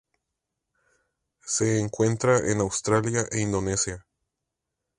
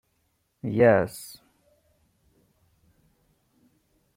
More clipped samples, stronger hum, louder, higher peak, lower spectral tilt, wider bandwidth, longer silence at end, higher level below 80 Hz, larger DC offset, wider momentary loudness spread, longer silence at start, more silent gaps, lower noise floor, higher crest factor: neither; neither; about the same, -25 LUFS vs -23 LUFS; about the same, -6 dBFS vs -6 dBFS; second, -4.5 dB/octave vs -7 dB/octave; second, 11 kHz vs 16.5 kHz; second, 1 s vs 2.85 s; first, -52 dBFS vs -64 dBFS; neither; second, 7 LU vs 22 LU; first, 1.45 s vs 0.65 s; neither; first, -84 dBFS vs -72 dBFS; about the same, 20 dB vs 22 dB